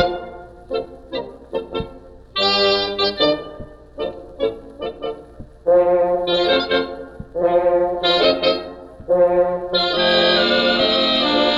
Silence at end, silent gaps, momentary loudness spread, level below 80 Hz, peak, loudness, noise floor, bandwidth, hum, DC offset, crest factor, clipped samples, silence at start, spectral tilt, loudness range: 0 s; none; 16 LU; -44 dBFS; -4 dBFS; -18 LUFS; -40 dBFS; 7.6 kHz; none; under 0.1%; 16 dB; under 0.1%; 0 s; -5 dB/octave; 5 LU